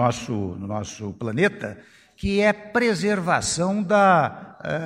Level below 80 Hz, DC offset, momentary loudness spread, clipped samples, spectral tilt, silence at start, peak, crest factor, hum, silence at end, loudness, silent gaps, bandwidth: -48 dBFS; under 0.1%; 13 LU; under 0.1%; -5 dB/octave; 0 s; -4 dBFS; 18 dB; none; 0 s; -22 LUFS; none; 13 kHz